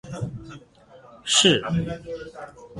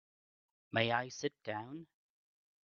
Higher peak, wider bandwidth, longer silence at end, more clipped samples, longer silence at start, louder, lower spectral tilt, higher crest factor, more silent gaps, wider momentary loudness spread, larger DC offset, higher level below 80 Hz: first, -4 dBFS vs -14 dBFS; first, 11.5 kHz vs 7.2 kHz; second, 0 s vs 0.8 s; neither; second, 0.05 s vs 0.75 s; first, -21 LUFS vs -37 LUFS; about the same, -3 dB/octave vs -3 dB/octave; about the same, 22 dB vs 26 dB; neither; first, 24 LU vs 15 LU; neither; first, -52 dBFS vs -80 dBFS